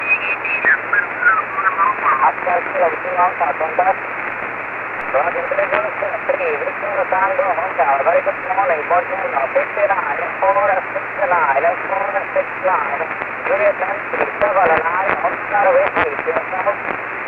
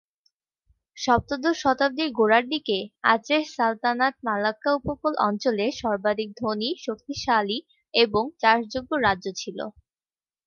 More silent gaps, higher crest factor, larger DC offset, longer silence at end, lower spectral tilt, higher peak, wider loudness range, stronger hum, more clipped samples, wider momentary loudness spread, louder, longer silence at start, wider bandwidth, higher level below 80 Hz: neither; about the same, 16 dB vs 20 dB; neither; second, 0 s vs 0.75 s; first, -6.5 dB/octave vs -4 dB/octave; first, 0 dBFS vs -4 dBFS; about the same, 3 LU vs 3 LU; neither; neither; second, 6 LU vs 9 LU; first, -17 LUFS vs -24 LUFS; second, 0 s vs 0.95 s; second, 5 kHz vs 7.2 kHz; about the same, -56 dBFS vs -54 dBFS